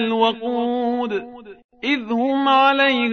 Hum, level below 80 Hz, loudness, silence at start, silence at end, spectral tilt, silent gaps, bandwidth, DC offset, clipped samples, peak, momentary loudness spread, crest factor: none; -64 dBFS; -19 LUFS; 0 s; 0 s; -5 dB/octave; 1.64-1.69 s; 6.6 kHz; under 0.1%; under 0.1%; -4 dBFS; 12 LU; 16 dB